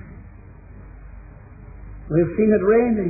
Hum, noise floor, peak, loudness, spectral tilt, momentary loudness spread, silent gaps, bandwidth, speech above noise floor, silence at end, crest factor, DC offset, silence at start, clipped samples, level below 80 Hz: none; -42 dBFS; -6 dBFS; -18 LUFS; -15.5 dB/octave; 26 LU; none; 2.6 kHz; 25 dB; 0 s; 16 dB; under 0.1%; 0.05 s; under 0.1%; -42 dBFS